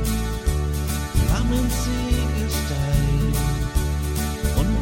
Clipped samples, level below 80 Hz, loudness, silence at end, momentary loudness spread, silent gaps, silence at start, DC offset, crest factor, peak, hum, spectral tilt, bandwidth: under 0.1%; -24 dBFS; -23 LUFS; 0 s; 3 LU; none; 0 s; under 0.1%; 16 dB; -6 dBFS; none; -5.5 dB/octave; 17 kHz